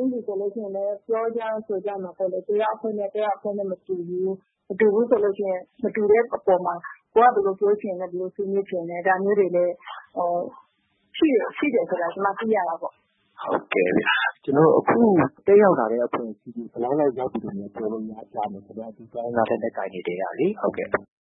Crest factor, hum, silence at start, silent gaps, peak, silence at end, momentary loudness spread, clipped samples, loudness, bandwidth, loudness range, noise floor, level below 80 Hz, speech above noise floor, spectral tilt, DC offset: 20 dB; none; 0 s; none; -4 dBFS; 0.2 s; 14 LU; under 0.1%; -23 LUFS; 4 kHz; 7 LU; -68 dBFS; -66 dBFS; 45 dB; -10.5 dB/octave; under 0.1%